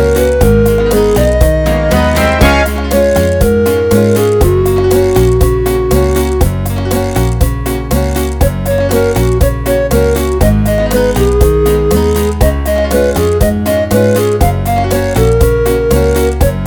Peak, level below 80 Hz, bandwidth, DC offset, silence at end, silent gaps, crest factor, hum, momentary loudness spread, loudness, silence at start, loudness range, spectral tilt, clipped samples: 0 dBFS; -16 dBFS; over 20 kHz; under 0.1%; 0 s; none; 10 dB; none; 4 LU; -11 LUFS; 0 s; 3 LU; -6 dB/octave; 0.3%